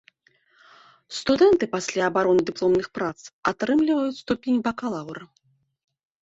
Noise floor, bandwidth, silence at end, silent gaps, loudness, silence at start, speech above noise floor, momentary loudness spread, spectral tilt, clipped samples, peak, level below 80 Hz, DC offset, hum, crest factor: -63 dBFS; 8 kHz; 0.95 s; 3.33-3.43 s; -23 LUFS; 1.1 s; 41 dB; 12 LU; -5 dB/octave; under 0.1%; -6 dBFS; -58 dBFS; under 0.1%; none; 18 dB